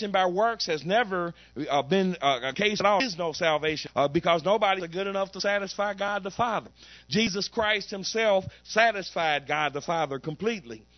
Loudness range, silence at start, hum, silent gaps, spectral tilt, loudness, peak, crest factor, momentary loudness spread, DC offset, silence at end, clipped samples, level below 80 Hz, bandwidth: 2 LU; 0 s; none; none; -4 dB/octave; -26 LUFS; -6 dBFS; 20 dB; 7 LU; under 0.1%; 0.2 s; under 0.1%; -60 dBFS; 6.4 kHz